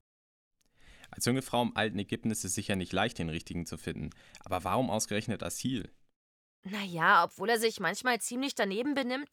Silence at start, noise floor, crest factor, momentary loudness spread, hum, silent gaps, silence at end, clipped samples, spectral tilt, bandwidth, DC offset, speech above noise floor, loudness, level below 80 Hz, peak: 0.85 s; -59 dBFS; 22 dB; 11 LU; none; 6.16-6.63 s; 0.05 s; under 0.1%; -4 dB/octave; 18 kHz; under 0.1%; 27 dB; -32 LUFS; -60 dBFS; -12 dBFS